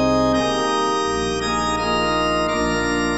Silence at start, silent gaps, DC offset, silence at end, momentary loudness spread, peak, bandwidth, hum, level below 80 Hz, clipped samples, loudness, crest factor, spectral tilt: 0 s; none; 0.5%; 0 s; 3 LU; -6 dBFS; 12 kHz; none; -38 dBFS; under 0.1%; -20 LUFS; 14 dB; -4 dB/octave